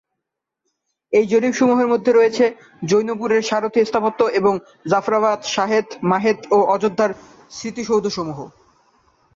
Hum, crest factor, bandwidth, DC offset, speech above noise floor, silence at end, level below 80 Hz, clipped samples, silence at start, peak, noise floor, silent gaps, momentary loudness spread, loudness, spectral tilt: none; 14 dB; 7.6 kHz; under 0.1%; 63 dB; 0.85 s; -60 dBFS; under 0.1%; 1.1 s; -4 dBFS; -81 dBFS; none; 12 LU; -18 LUFS; -5 dB/octave